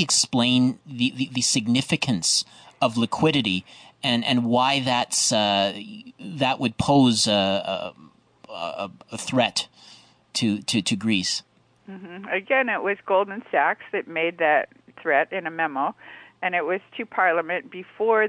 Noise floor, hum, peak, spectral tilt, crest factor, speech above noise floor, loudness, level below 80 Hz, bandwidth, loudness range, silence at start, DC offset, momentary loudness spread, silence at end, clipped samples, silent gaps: -52 dBFS; none; -8 dBFS; -3.5 dB/octave; 16 dB; 28 dB; -23 LUFS; -62 dBFS; 10 kHz; 4 LU; 0 s; under 0.1%; 14 LU; 0 s; under 0.1%; none